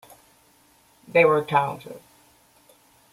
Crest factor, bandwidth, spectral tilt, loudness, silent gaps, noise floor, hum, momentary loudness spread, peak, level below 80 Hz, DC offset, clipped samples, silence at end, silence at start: 20 dB; 15.5 kHz; -6 dB/octave; -21 LUFS; none; -59 dBFS; none; 24 LU; -6 dBFS; -68 dBFS; under 0.1%; under 0.1%; 1.15 s; 1.15 s